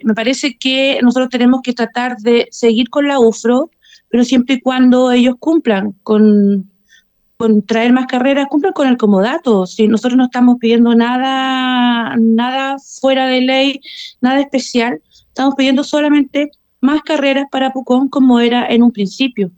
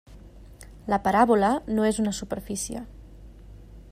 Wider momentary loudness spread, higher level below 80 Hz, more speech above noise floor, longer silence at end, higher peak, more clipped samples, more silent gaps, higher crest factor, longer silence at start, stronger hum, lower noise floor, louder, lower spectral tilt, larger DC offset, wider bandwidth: second, 7 LU vs 17 LU; second, -56 dBFS vs -46 dBFS; first, 39 dB vs 22 dB; about the same, 0.1 s vs 0.1 s; first, -2 dBFS vs -6 dBFS; neither; neither; second, 12 dB vs 20 dB; about the same, 0.05 s vs 0.1 s; neither; first, -51 dBFS vs -46 dBFS; first, -13 LUFS vs -24 LUFS; about the same, -5 dB/octave vs -5 dB/octave; neither; second, 8.8 kHz vs 15.5 kHz